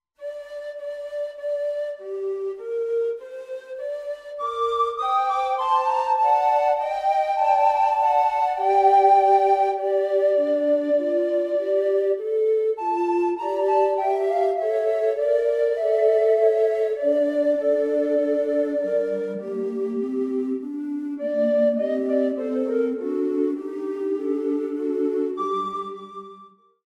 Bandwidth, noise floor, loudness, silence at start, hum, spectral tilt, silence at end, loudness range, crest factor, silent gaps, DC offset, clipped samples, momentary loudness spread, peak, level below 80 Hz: 10 kHz; -50 dBFS; -22 LUFS; 0.2 s; none; -6 dB/octave; 0.4 s; 8 LU; 16 dB; none; under 0.1%; under 0.1%; 12 LU; -6 dBFS; -66 dBFS